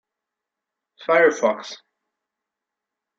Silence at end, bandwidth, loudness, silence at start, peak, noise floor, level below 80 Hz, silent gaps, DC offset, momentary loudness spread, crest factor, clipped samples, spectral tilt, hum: 1.45 s; 7.8 kHz; -19 LUFS; 1 s; -4 dBFS; -85 dBFS; -78 dBFS; none; under 0.1%; 21 LU; 22 dB; under 0.1%; -3.5 dB/octave; none